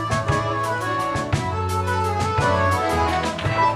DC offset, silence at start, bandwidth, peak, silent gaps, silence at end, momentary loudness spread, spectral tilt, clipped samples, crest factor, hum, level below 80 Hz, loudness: under 0.1%; 0 s; 15.5 kHz; -8 dBFS; none; 0 s; 4 LU; -5.5 dB/octave; under 0.1%; 14 dB; none; -38 dBFS; -22 LUFS